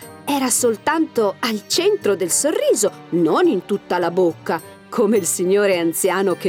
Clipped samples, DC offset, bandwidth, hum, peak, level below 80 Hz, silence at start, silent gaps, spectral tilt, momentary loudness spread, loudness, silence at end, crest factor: under 0.1%; under 0.1%; 18 kHz; none; -6 dBFS; -66 dBFS; 0 s; none; -3.5 dB/octave; 6 LU; -18 LUFS; 0 s; 12 dB